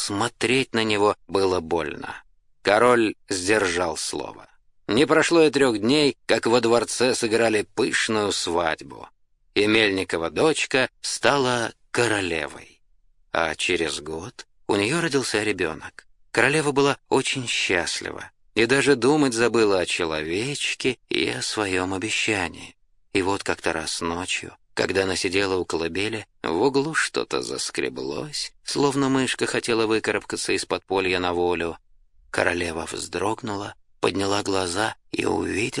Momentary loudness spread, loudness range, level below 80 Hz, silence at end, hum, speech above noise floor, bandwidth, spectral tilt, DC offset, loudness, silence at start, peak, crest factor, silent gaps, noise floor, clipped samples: 10 LU; 5 LU; -56 dBFS; 0 s; none; 35 dB; 11.5 kHz; -3.5 dB/octave; under 0.1%; -23 LUFS; 0 s; 0 dBFS; 22 dB; none; -58 dBFS; under 0.1%